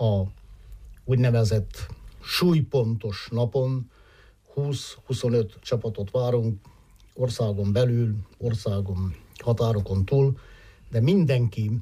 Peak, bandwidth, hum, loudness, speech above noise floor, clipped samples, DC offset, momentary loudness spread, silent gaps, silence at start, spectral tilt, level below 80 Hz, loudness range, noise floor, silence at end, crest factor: -12 dBFS; 15 kHz; none; -25 LUFS; 30 dB; under 0.1%; under 0.1%; 12 LU; none; 0 s; -7 dB/octave; -48 dBFS; 3 LU; -54 dBFS; 0 s; 12 dB